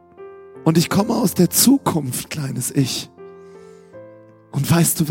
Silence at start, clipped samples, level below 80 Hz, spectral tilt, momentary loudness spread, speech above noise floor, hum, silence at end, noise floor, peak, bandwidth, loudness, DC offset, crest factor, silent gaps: 0.2 s; under 0.1%; -54 dBFS; -4.5 dB/octave; 13 LU; 27 dB; none; 0 s; -44 dBFS; -2 dBFS; 17 kHz; -18 LUFS; under 0.1%; 18 dB; none